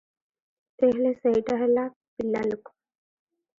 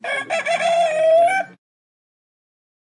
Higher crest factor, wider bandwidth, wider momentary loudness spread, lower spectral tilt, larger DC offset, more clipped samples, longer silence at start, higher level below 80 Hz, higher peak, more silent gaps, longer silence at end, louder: first, 18 dB vs 12 dB; second, 7.4 kHz vs 11.5 kHz; first, 11 LU vs 8 LU; first, -7.5 dB/octave vs -2 dB/octave; neither; neither; first, 0.8 s vs 0.05 s; first, -64 dBFS vs -86 dBFS; about the same, -10 dBFS vs -8 dBFS; first, 1.96-2.01 s, 2.08-2.17 s vs none; second, 1 s vs 1.5 s; second, -25 LUFS vs -18 LUFS